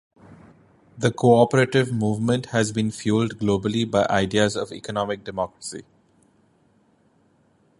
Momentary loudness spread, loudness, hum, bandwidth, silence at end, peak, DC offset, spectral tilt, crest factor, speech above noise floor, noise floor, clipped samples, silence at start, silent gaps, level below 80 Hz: 12 LU; -22 LUFS; none; 11.5 kHz; 2 s; -4 dBFS; under 0.1%; -5.5 dB/octave; 20 dB; 40 dB; -61 dBFS; under 0.1%; 0.3 s; none; -54 dBFS